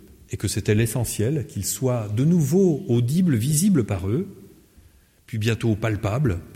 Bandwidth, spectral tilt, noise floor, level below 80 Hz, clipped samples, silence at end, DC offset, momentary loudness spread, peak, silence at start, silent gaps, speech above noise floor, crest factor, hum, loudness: 16.5 kHz; -6 dB/octave; -54 dBFS; -46 dBFS; under 0.1%; 0 s; under 0.1%; 8 LU; -6 dBFS; 0.3 s; none; 32 dB; 16 dB; none; -22 LUFS